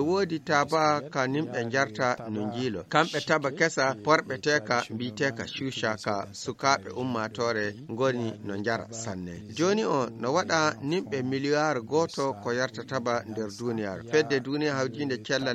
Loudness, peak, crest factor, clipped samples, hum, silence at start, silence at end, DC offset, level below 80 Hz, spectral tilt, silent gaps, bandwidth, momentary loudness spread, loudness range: -28 LUFS; -6 dBFS; 22 dB; under 0.1%; none; 0 s; 0 s; under 0.1%; -66 dBFS; -4.5 dB/octave; none; 13 kHz; 8 LU; 3 LU